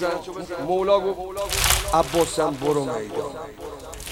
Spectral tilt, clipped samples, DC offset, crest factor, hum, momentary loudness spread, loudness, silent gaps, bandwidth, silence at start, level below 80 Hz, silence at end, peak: -3.5 dB/octave; under 0.1%; under 0.1%; 24 dB; none; 16 LU; -23 LUFS; none; 17 kHz; 0 s; -38 dBFS; 0 s; 0 dBFS